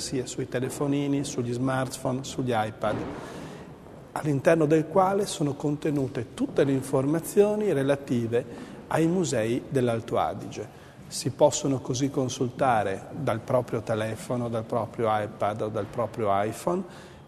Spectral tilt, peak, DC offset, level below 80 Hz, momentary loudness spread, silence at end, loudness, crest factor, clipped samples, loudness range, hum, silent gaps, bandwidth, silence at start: -6 dB/octave; -6 dBFS; under 0.1%; -58 dBFS; 13 LU; 0 s; -27 LUFS; 20 dB; under 0.1%; 4 LU; none; none; 13.5 kHz; 0 s